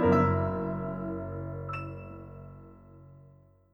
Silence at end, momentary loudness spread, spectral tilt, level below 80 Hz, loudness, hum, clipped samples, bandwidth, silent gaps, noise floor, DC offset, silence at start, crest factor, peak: 0.5 s; 27 LU; -9.5 dB/octave; -52 dBFS; -31 LUFS; none; under 0.1%; 6.6 kHz; none; -58 dBFS; under 0.1%; 0 s; 20 dB; -12 dBFS